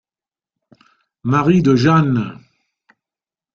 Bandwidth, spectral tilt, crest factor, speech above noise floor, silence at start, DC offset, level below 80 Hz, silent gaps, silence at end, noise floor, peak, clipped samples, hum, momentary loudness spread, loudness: 7.4 kHz; -7.5 dB/octave; 18 dB; over 76 dB; 1.25 s; under 0.1%; -52 dBFS; none; 1.2 s; under -90 dBFS; -2 dBFS; under 0.1%; none; 13 LU; -15 LUFS